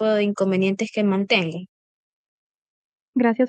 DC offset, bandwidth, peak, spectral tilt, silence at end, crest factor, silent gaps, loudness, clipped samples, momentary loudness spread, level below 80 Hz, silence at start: under 0.1%; 8.8 kHz; -6 dBFS; -6 dB/octave; 0 s; 16 dB; 1.69-3.13 s; -22 LUFS; under 0.1%; 9 LU; -72 dBFS; 0 s